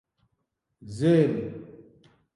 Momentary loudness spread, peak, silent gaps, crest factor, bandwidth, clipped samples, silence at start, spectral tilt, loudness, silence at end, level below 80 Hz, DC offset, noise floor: 21 LU; -8 dBFS; none; 20 dB; 11.5 kHz; under 0.1%; 0.8 s; -8 dB/octave; -24 LUFS; 0.55 s; -62 dBFS; under 0.1%; -78 dBFS